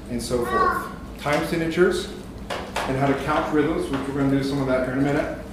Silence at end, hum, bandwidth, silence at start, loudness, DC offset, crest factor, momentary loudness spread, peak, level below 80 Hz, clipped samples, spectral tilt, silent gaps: 0 s; none; 15.5 kHz; 0 s; -23 LUFS; under 0.1%; 16 dB; 10 LU; -6 dBFS; -40 dBFS; under 0.1%; -6 dB/octave; none